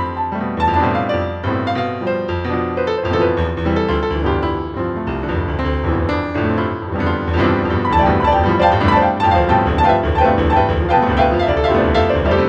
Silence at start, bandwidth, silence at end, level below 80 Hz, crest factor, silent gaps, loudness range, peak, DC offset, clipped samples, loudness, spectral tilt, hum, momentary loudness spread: 0 s; 7.8 kHz; 0 s; -26 dBFS; 16 dB; none; 5 LU; 0 dBFS; under 0.1%; under 0.1%; -17 LUFS; -8 dB/octave; none; 7 LU